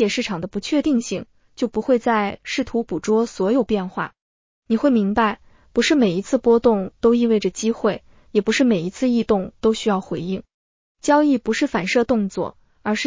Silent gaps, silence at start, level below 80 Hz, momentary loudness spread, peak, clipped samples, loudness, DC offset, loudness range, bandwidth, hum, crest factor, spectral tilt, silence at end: 4.22-4.62 s, 10.54-10.95 s; 0 s; -50 dBFS; 10 LU; -4 dBFS; under 0.1%; -20 LUFS; under 0.1%; 3 LU; 7.6 kHz; none; 16 dB; -5 dB/octave; 0 s